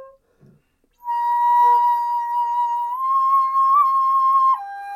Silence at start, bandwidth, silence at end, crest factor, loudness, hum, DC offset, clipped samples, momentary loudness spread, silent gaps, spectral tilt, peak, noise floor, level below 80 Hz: 0 s; 15 kHz; 0 s; 10 dB; -18 LUFS; none; under 0.1%; under 0.1%; 8 LU; none; -1.5 dB/octave; -10 dBFS; -60 dBFS; -70 dBFS